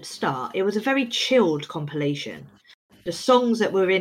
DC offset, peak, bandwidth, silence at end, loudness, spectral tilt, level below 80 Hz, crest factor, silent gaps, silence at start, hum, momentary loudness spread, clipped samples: under 0.1%; -6 dBFS; 16 kHz; 0 s; -23 LUFS; -4.5 dB/octave; -66 dBFS; 18 dB; 2.74-2.89 s; 0 s; none; 13 LU; under 0.1%